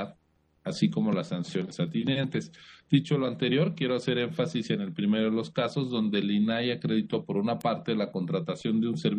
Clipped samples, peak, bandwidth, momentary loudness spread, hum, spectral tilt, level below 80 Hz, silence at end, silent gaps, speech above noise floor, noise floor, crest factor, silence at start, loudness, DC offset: under 0.1%; -10 dBFS; 9.6 kHz; 6 LU; none; -7 dB/octave; -70 dBFS; 0 s; none; 40 dB; -68 dBFS; 18 dB; 0 s; -29 LUFS; under 0.1%